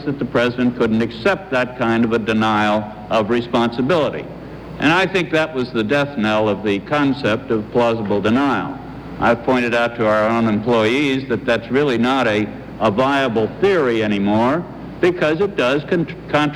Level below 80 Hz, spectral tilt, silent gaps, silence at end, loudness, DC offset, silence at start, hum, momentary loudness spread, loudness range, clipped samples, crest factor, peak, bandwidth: -46 dBFS; -6.5 dB/octave; none; 0 s; -18 LUFS; under 0.1%; 0 s; none; 5 LU; 1 LU; under 0.1%; 14 dB; -2 dBFS; 12 kHz